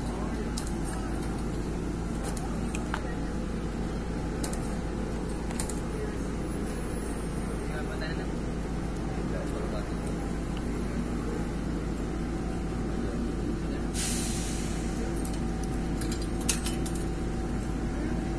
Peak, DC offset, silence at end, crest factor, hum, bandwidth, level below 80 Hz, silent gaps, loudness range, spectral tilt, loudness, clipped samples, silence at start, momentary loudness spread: -10 dBFS; 0.3%; 0 s; 20 dB; none; 11 kHz; -36 dBFS; none; 2 LU; -5.5 dB/octave; -33 LUFS; under 0.1%; 0 s; 3 LU